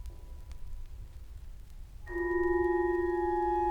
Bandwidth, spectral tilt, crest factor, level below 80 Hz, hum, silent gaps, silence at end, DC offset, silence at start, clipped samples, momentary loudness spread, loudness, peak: 6.2 kHz; -8 dB/octave; 14 dB; -44 dBFS; none; none; 0 s; under 0.1%; 0 s; under 0.1%; 22 LU; -31 LUFS; -20 dBFS